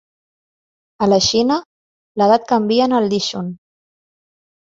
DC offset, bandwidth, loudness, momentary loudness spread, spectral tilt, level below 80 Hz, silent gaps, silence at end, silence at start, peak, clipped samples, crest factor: under 0.1%; 7.8 kHz; -16 LUFS; 11 LU; -4.5 dB/octave; -52 dBFS; 1.66-2.15 s; 1.15 s; 1 s; -2 dBFS; under 0.1%; 18 dB